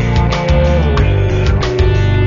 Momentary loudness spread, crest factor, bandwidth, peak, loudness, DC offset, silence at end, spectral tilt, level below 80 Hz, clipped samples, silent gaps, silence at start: 2 LU; 10 dB; 7.4 kHz; -2 dBFS; -13 LUFS; under 0.1%; 0 s; -7 dB/octave; -16 dBFS; under 0.1%; none; 0 s